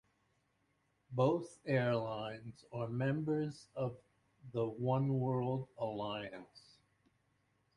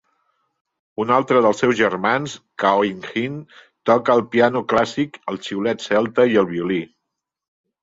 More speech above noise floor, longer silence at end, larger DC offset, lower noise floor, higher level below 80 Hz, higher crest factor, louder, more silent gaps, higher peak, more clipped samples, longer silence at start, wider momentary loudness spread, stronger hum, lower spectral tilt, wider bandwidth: second, 41 dB vs 62 dB; first, 1.2 s vs 0.95 s; neither; about the same, -79 dBFS vs -80 dBFS; second, -72 dBFS vs -60 dBFS; about the same, 20 dB vs 18 dB; second, -38 LUFS vs -19 LUFS; neither; second, -20 dBFS vs -2 dBFS; neither; about the same, 1.1 s vs 1 s; about the same, 11 LU vs 11 LU; neither; first, -8 dB/octave vs -5.5 dB/octave; first, 11 kHz vs 7.8 kHz